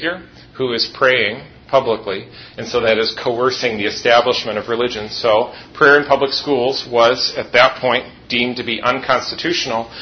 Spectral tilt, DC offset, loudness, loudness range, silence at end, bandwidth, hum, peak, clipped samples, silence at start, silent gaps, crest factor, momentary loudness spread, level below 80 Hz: -3.5 dB/octave; under 0.1%; -16 LUFS; 3 LU; 0 s; 6.6 kHz; none; 0 dBFS; under 0.1%; 0 s; none; 16 dB; 9 LU; -52 dBFS